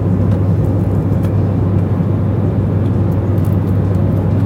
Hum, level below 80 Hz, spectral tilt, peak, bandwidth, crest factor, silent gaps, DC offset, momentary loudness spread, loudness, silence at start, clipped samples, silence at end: none; -28 dBFS; -10.5 dB/octave; -4 dBFS; 3.9 kHz; 10 dB; none; under 0.1%; 1 LU; -15 LUFS; 0 s; under 0.1%; 0 s